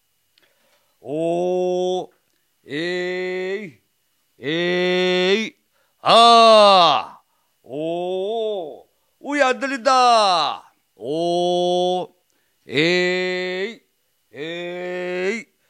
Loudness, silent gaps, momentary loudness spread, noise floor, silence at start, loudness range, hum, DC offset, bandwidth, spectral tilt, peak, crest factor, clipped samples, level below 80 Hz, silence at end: -18 LUFS; none; 19 LU; -68 dBFS; 1.05 s; 10 LU; none; under 0.1%; 11.5 kHz; -4 dB/octave; 0 dBFS; 20 dB; under 0.1%; -76 dBFS; 0.25 s